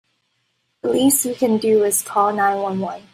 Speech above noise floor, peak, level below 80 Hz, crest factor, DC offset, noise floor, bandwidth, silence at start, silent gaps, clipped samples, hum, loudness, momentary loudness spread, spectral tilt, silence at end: 51 dB; -4 dBFS; -64 dBFS; 16 dB; under 0.1%; -69 dBFS; 16 kHz; 0.85 s; none; under 0.1%; none; -18 LUFS; 8 LU; -3.5 dB/octave; 0.15 s